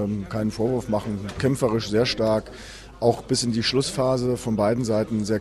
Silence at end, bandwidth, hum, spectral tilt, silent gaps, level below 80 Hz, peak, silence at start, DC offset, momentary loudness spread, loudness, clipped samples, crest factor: 0 s; 14 kHz; none; -5.5 dB/octave; none; -46 dBFS; -6 dBFS; 0 s; under 0.1%; 6 LU; -24 LUFS; under 0.1%; 18 dB